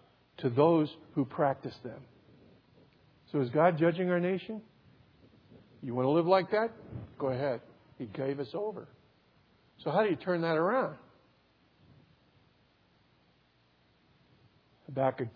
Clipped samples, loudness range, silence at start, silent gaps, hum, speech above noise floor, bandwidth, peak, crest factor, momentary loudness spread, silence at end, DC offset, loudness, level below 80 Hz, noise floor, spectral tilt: under 0.1%; 6 LU; 0.4 s; none; none; 38 dB; 5.4 kHz; -12 dBFS; 22 dB; 19 LU; 0.05 s; under 0.1%; -31 LUFS; -72 dBFS; -68 dBFS; -6 dB/octave